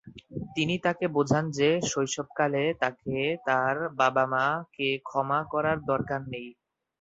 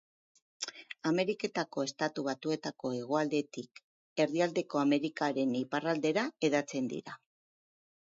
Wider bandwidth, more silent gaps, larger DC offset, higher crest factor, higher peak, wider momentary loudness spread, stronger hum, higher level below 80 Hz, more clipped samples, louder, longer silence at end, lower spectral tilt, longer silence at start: about the same, 8 kHz vs 7.8 kHz; second, none vs 3.84-4.16 s; neither; about the same, 20 dB vs 18 dB; first, -8 dBFS vs -16 dBFS; second, 8 LU vs 11 LU; neither; first, -62 dBFS vs -82 dBFS; neither; first, -27 LUFS vs -33 LUFS; second, 0.5 s vs 0.95 s; about the same, -4.5 dB/octave vs -5 dB/octave; second, 0.05 s vs 0.6 s